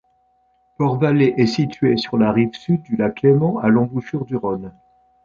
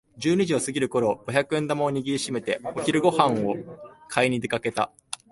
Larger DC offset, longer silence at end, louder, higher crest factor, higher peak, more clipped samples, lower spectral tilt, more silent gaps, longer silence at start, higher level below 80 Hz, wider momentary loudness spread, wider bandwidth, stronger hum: neither; first, 0.55 s vs 0.15 s; first, -18 LUFS vs -25 LUFS; about the same, 16 dB vs 20 dB; about the same, -2 dBFS vs -4 dBFS; neither; first, -8 dB/octave vs -5 dB/octave; neither; first, 0.8 s vs 0.15 s; first, -52 dBFS vs -62 dBFS; about the same, 9 LU vs 7 LU; second, 7.2 kHz vs 11.5 kHz; neither